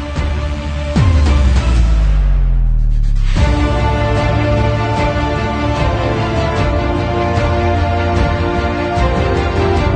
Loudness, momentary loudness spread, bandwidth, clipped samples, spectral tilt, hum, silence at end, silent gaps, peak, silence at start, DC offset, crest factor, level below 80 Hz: -15 LUFS; 4 LU; 9 kHz; under 0.1%; -7 dB/octave; none; 0 s; none; -2 dBFS; 0 s; under 0.1%; 12 dB; -16 dBFS